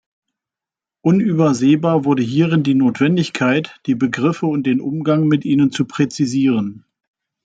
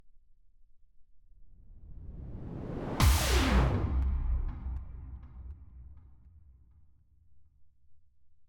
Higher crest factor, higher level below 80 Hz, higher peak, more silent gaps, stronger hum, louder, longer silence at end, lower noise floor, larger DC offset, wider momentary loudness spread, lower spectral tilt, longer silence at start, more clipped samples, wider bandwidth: second, 14 dB vs 22 dB; second, -60 dBFS vs -36 dBFS; first, -2 dBFS vs -12 dBFS; neither; neither; first, -17 LUFS vs -31 LUFS; first, 0.7 s vs 0.05 s; first, -88 dBFS vs -60 dBFS; neither; second, 5 LU vs 24 LU; first, -7 dB/octave vs -5 dB/octave; first, 1.05 s vs 0.05 s; neither; second, 9 kHz vs 19 kHz